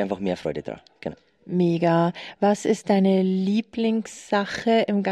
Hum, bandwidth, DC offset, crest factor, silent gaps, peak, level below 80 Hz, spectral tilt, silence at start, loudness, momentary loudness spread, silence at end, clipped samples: none; 10.5 kHz; under 0.1%; 14 dB; none; -8 dBFS; -62 dBFS; -6.5 dB/octave; 0 s; -23 LUFS; 14 LU; 0 s; under 0.1%